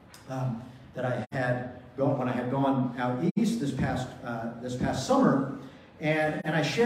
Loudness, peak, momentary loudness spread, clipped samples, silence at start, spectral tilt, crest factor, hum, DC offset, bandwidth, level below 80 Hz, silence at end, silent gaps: -29 LUFS; -10 dBFS; 10 LU; under 0.1%; 0.1 s; -6.5 dB/octave; 20 dB; none; under 0.1%; 15 kHz; -56 dBFS; 0 s; 3.31-3.35 s